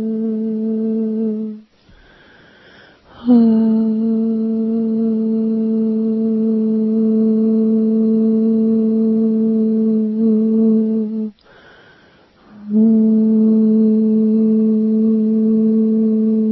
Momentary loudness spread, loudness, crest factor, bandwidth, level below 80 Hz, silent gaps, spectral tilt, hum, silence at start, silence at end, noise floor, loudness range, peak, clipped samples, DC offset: 7 LU; -15 LUFS; 12 dB; 1.8 kHz; -60 dBFS; none; -12.5 dB/octave; none; 0 s; 0 s; -49 dBFS; 4 LU; -4 dBFS; under 0.1%; under 0.1%